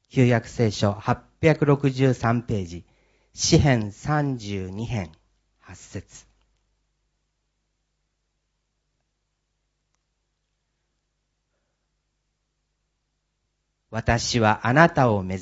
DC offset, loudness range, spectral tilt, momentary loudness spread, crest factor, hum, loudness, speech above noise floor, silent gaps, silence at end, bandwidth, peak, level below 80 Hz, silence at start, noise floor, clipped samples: under 0.1%; 14 LU; -5.5 dB/octave; 18 LU; 26 dB; 50 Hz at -50 dBFS; -22 LUFS; 54 dB; none; 0 s; 8 kHz; 0 dBFS; -48 dBFS; 0.15 s; -76 dBFS; under 0.1%